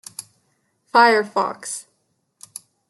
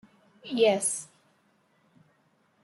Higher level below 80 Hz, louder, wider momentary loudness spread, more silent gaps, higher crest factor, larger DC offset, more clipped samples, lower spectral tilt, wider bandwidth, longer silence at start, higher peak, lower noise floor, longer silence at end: about the same, -80 dBFS vs -82 dBFS; first, -18 LUFS vs -26 LUFS; about the same, 24 LU vs 25 LU; neither; about the same, 20 dB vs 20 dB; neither; neither; about the same, -2 dB/octave vs -2.5 dB/octave; about the same, 12.5 kHz vs 12 kHz; second, 0.2 s vs 0.45 s; first, -2 dBFS vs -12 dBFS; about the same, -69 dBFS vs -68 dBFS; second, 1.1 s vs 1.6 s